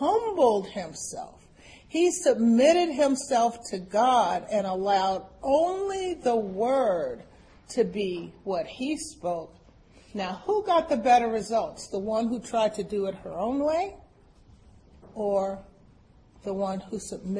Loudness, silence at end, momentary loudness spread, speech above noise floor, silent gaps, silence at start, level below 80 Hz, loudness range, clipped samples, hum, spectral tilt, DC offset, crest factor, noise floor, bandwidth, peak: -26 LUFS; 0 s; 14 LU; 30 dB; none; 0 s; -58 dBFS; 8 LU; under 0.1%; none; -4.5 dB/octave; under 0.1%; 18 dB; -56 dBFS; 10.5 kHz; -8 dBFS